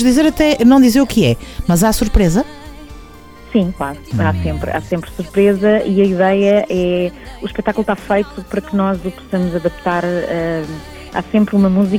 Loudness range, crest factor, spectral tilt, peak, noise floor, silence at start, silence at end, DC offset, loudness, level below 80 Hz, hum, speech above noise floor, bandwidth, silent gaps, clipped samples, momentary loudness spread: 5 LU; 14 dB; -6 dB/octave; -2 dBFS; -37 dBFS; 0 s; 0 s; under 0.1%; -15 LUFS; -30 dBFS; none; 23 dB; 19.5 kHz; none; under 0.1%; 11 LU